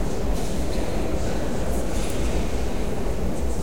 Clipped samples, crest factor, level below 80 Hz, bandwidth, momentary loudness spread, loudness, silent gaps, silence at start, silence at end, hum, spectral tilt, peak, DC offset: under 0.1%; 12 dB; -28 dBFS; 17.5 kHz; 2 LU; -28 LUFS; none; 0 s; 0 s; none; -5.5 dB/octave; -10 dBFS; 6%